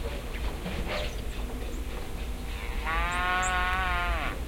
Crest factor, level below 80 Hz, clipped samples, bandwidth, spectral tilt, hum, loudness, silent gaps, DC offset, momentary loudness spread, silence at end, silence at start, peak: 18 dB; -34 dBFS; under 0.1%; 16.5 kHz; -4 dB/octave; none; -31 LUFS; none; under 0.1%; 11 LU; 0 s; 0 s; -12 dBFS